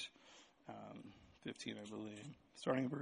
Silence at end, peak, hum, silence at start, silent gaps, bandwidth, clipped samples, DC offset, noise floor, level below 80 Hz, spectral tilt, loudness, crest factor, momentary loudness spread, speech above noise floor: 0 s; -22 dBFS; none; 0 s; none; 10 kHz; under 0.1%; under 0.1%; -66 dBFS; -80 dBFS; -5.5 dB/octave; -48 LUFS; 24 dB; 20 LU; 21 dB